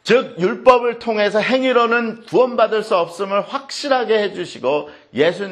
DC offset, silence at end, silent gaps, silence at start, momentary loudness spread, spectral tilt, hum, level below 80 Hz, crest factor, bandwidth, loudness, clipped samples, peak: under 0.1%; 0 s; none; 0.05 s; 9 LU; -4.5 dB/octave; none; -58 dBFS; 18 dB; 11 kHz; -17 LUFS; under 0.1%; 0 dBFS